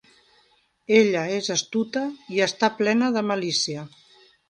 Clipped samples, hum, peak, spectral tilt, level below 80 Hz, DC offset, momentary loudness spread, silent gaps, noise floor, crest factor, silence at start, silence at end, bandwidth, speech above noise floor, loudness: under 0.1%; none; -4 dBFS; -3.5 dB/octave; -70 dBFS; under 0.1%; 10 LU; none; -63 dBFS; 20 dB; 0.9 s; 0.6 s; 10.5 kHz; 40 dB; -23 LUFS